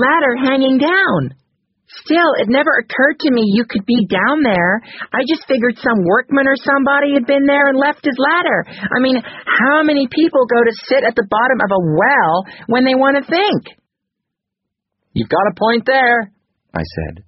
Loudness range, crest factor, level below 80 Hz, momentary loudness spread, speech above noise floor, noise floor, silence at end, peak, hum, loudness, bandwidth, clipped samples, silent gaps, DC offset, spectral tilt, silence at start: 4 LU; 14 dB; -48 dBFS; 7 LU; 65 dB; -79 dBFS; 0.05 s; 0 dBFS; none; -14 LUFS; 6 kHz; under 0.1%; none; under 0.1%; -3.5 dB/octave; 0 s